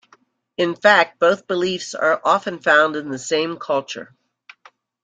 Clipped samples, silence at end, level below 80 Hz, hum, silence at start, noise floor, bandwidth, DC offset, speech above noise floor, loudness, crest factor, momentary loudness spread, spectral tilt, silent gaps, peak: under 0.1%; 1 s; -68 dBFS; none; 0.6 s; -57 dBFS; 9.4 kHz; under 0.1%; 38 dB; -18 LUFS; 18 dB; 10 LU; -3.5 dB/octave; none; -2 dBFS